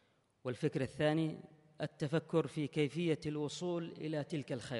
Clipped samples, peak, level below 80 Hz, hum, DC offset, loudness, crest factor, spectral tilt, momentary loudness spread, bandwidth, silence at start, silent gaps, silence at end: under 0.1%; -20 dBFS; -72 dBFS; none; under 0.1%; -38 LUFS; 16 dB; -6.5 dB/octave; 10 LU; 11.5 kHz; 0.45 s; none; 0 s